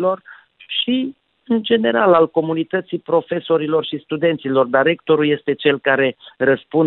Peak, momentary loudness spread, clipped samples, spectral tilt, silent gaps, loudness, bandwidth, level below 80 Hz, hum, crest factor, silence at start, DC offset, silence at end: -2 dBFS; 7 LU; under 0.1%; -10 dB/octave; none; -18 LUFS; 4.2 kHz; -64 dBFS; none; 14 dB; 0 s; under 0.1%; 0 s